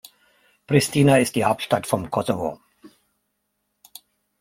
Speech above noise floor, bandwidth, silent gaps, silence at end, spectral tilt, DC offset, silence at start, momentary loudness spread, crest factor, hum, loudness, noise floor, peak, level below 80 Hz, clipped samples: 55 dB; 16.5 kHz; none; 1.55 s; -5.5 dB/octave; under 0.1%; 0.7 s; 9 LU; 20 dB; none; -21 LUFS; -75 dBFS; -2 dBFS; -58 dBFS; under 0.1%